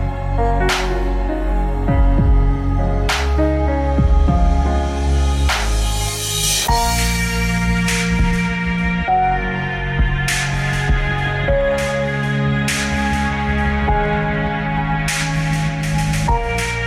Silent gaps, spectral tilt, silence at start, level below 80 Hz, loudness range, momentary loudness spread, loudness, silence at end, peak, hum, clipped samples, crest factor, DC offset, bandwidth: none; -4.5 dB/octave; 0 s; -20 dBFS; 1 LU; 4 LU; -18 LUFS; 0 s; -6 dBFS; none; under 0.1%; 10 dB; under 0.1%; 16 kHz